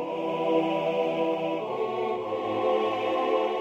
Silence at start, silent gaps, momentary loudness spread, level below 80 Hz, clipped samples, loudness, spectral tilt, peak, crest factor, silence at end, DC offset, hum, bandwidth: 0 s; none; 4 LU; -72 dBFS; under 0.1%; -27 LUFS; -6.5 dB/octave; -12 dBFS; 14 dB; 0 s; under 0.1%; none; 8.2 kHz